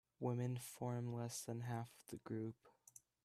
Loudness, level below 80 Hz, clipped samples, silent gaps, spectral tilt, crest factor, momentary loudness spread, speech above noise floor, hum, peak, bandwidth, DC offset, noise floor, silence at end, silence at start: -47 LUFS; -80 dBFS; under 0.1%; none; -6 dB/octave; 18 dB; 20 LU; 23 dB; none; -28 dBFS; 14.5 kHz; under 0.1%; -68 dBFS; 0.55 s; 0.2 s